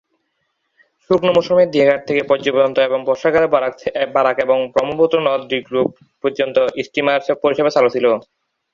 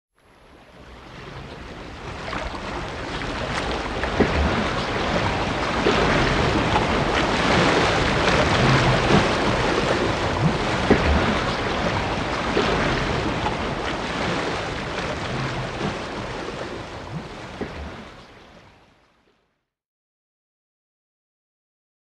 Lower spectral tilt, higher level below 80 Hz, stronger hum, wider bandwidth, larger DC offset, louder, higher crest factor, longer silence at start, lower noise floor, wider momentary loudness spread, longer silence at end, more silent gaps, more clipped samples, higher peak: about the same, -5.5 dB/octave vs -5 dB/octave; second, -58 dBFS vs -34 dBFS; neither; second, 7.4 kHz vs 12 kHz; neither; first, -16 LUFS vs -22 LUFS; about the same, 16 dB vs 20 dB; first, 1.1 s vs 0.7 s; about the same, -70 dBFS vs -72 dBFS; second, 6 LU vs 16 LU; second, 0.55 s vs 3.45 s; neither; neither; about the same, -2 dBFS vs -4 dBFS